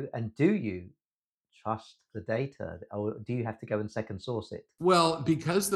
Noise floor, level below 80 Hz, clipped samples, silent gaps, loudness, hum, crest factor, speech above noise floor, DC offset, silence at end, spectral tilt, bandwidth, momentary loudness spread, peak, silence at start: under -90 dBFS; -64 dBFS; under 0.1%; 1.05-1.20 s, 1.27-1.41 s; -31 LUFS; none; 20 dB; over 60 dB; under 0.1%; 0 s; -5.5 dB/octave; 12.5 kHz; 16 LU; -10 dBFS; 0 s